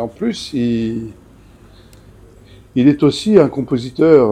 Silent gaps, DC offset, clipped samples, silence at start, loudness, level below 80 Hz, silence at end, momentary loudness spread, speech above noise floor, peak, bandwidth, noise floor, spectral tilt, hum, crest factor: none; under 0.1%; 0.1%; 0 s; -15 LUFS; -46 dBFS; 0 s; 11 LU; 29 dB; 0 dBFS; 11.5 kHz; -43 dBFS; -7 dB/octave; none; 16 dB